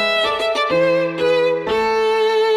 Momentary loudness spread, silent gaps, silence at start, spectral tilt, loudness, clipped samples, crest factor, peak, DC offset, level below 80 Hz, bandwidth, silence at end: 2 LU; none; 0 s; -4 dB/octave; -17 LUFS; under 0.1%; 10 dB; -6 dBFS; under 0.1%; -52 dBFS; 14 kHz; 0 s